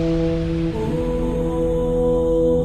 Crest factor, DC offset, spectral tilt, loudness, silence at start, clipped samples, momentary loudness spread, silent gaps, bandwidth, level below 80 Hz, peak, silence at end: 12 dB; under 0.1%; -8.5 dB/octave; -21 LUFS; 0 s; under 0.1%; 4 LU; none; 11 kHz; -28 dBFS; -8 dBFS; 0 s